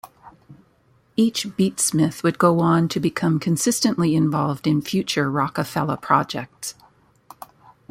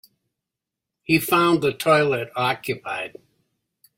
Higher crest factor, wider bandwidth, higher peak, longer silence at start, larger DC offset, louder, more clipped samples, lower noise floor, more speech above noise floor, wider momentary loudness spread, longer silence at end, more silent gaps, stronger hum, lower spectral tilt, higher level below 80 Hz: about the same, 20 dB vs 20 dB; about the same, 16.5 kHz vs 16.5 kHz; about the same, -2 dBFS vs -4 dBFS; second, 0.05 s vs 1.1 s; neither; about the same, -21 LUFS vs -21 LUFS; neither; second, -59 dBFS vs -85 dBFS; second, 39 dB vs 64 dB; second, 7 LU vs 12 LU; first, 1.2 s vs 0.9 s; neither; neither; about the same, -5 dB/octave vs -5 dB/octave; about the same, -60 dBFS vs -62 dBFS